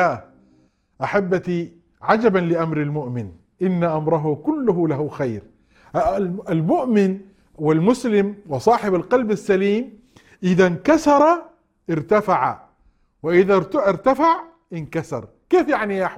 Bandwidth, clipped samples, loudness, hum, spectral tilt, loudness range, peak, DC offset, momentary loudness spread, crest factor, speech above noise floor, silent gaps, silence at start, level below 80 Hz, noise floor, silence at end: 12.5 kHz; under 0.1%; -20 LUFS; none; -7.5 dB/octave; 4 LU; -2 dBFS; under 0.1%; 12 LU; 18 dB; 41 dB; none; 0 s; -52 dBFS; -59 dBFS; 0 s